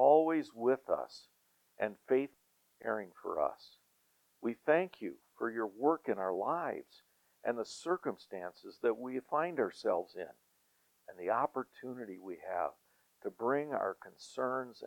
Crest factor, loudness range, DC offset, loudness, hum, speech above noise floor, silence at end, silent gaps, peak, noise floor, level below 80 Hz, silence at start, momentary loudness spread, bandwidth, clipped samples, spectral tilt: 22 dB; 3 LU; under 0.1%; -37 LUFS; none; 38 dB; 0 s; none; -14 dBFS; -74 dBFS; -82 dBFS; 0 s; 13 LU; 18.5 kHz; under 0.1%; -6 dB/octave